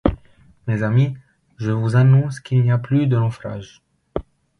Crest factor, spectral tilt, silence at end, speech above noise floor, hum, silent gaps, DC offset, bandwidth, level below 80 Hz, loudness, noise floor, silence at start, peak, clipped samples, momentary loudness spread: 18 dB; -8.5 dB/octave; 0.4 s; 34 dB; none; none; under 0.1%; 9.8 kHz; -40 dBFS; -19 LUFS; -51 dBFS; 0.05 s; 0 dBFS; under 0.1%; 17 LU